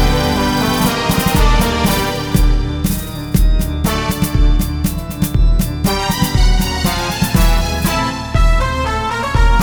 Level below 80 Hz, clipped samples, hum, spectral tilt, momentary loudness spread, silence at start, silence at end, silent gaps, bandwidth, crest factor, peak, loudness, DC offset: -16 dBFS; under 0.1%; none; -5 dB/octave; 4 LU; 0 s; 0 s; none; over 20 kHz; 12 dB; 0 dBFS; -16 LUFS; under 0.1%